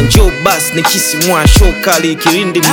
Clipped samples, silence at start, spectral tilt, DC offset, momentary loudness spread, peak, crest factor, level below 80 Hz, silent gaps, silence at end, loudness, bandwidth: 1%; 0 s; -3.5 dB/octave; under 0.1%; 3 LU; 0 dBFS; 10 dB; -14 dBFS; none; 0 s; -9 LUFS; over 20 kHz